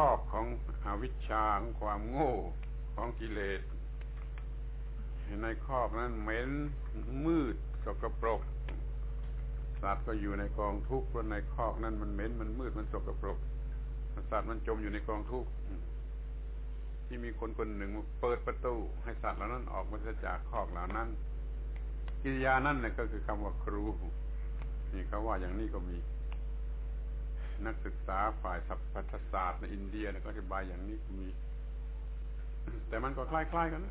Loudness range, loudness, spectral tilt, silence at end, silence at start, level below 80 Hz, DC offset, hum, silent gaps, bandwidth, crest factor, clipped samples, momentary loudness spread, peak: 4 LU; -38 LUFS; -6.5 dB/octave; 0 s; 0 s; -38 dBFS; under 0.1%; none; none; 4 kHz; 20 dB; under 0.1%; 10 LU; -16 dBFS